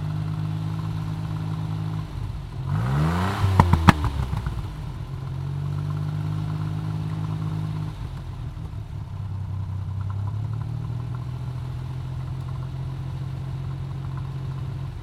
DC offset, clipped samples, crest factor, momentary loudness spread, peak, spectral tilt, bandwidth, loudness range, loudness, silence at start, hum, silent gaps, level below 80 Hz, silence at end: under 0.1%; under 0.1%; 26 dB; 10 LU; 0 dBFS; -7.5 dB/octave; 14 kHz; 8 LU; -28 LUFS; 0 s; none; none; -38 dBFS; 0 s